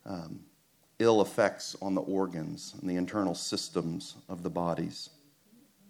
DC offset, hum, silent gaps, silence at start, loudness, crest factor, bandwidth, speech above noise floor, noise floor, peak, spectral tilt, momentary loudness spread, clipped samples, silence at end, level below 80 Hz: under 0.1%; none; none; 0.05 s; -32 LUFS; 22 dB; 19 kHz; 35 dB; -67 dBFS; -10 dBFS; -5 dB/octave; 16 LU; under 0.1%; 0.8 s; -70 dBFS